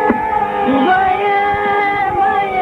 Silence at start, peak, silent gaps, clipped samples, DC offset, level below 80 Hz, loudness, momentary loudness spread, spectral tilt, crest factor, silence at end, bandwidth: 0 s; 0 dBFS; none; under 0.1%; under 0.1%; -42 dBFS; -14 LUFS; 3 LU; -6.5 dB/octave; 14 dB; 0 s; 5.8 kHz